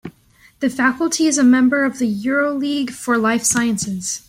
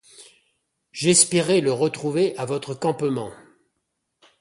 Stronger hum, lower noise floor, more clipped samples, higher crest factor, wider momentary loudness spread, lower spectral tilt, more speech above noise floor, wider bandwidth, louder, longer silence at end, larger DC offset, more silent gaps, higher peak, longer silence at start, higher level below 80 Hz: neither; second, -52 dBFS vs -77 dBFS; neither; second, 12 dB vs 22 dB; second, 9 LU vs 13 LU; about the same, -3.5 dB/octave vs -3.5 dB/octave; second, 35 dB vs 55 dB; first, 15.5 kHz vs 11.5 kHz; first, -17 LUFS vs -21 LUFS; second, 0.1 s vs 1.05 s; neither; neither; second, -6 dBFS vs -2 dBFS; second, 0.05 s vs 0.2 s; first, -56 dBFS vs -64 dBFS